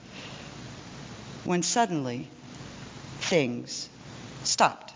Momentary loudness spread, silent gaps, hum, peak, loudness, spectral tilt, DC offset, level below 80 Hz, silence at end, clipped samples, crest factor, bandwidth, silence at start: 19 LU; none; none; -8 dBFS; -28 LUFS; -3.5 dB/octave; under 0.1%; -60 dBFS; 0 s; under 0.1%; 22 dB; 7.8 kHz; 0 s